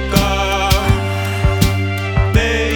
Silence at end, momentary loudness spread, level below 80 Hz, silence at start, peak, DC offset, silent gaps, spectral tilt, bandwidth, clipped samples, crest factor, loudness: 0 s; 3 LU; -22 dBFS; 0 s; 0 dBFS; under 0.1%; none; -5 dB/octave; 20 kHz; under 0.1%; 14 dB; -16 LUFS